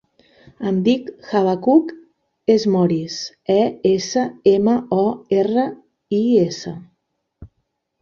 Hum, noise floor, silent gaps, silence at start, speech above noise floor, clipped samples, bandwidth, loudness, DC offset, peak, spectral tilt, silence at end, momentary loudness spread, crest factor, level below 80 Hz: none; -72 dBFS; none; 0.6 s; 55 dB; under 0.1%; 7.4 kHz; -18 LUFS; under 0.1%; -2 dBFS; -6.5 dB/octave; 0.55 s; 11 LU; 16 dB; -56 dBFS